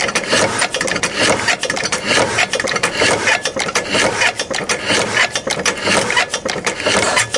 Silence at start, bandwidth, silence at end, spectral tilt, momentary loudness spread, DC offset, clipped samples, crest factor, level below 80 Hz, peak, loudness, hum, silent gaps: 0 s; 11.5 kHz; 0 s; -1.5 dB/octave; 5 LU; under 0.1%; under 0.1%; 16 dB; -48 dBFS; 0 dBFS; -15 LUFS; none; none